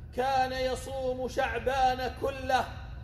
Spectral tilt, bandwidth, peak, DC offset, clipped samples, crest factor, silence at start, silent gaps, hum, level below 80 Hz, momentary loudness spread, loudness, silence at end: -4.5 dB/octave; 14.5 kHz; -14 dBFS; under 0.1%; under 0.1%; 16 dB; 0 s; none; none; -44 dBFS; 6 LU; -30 LUFS; 0 s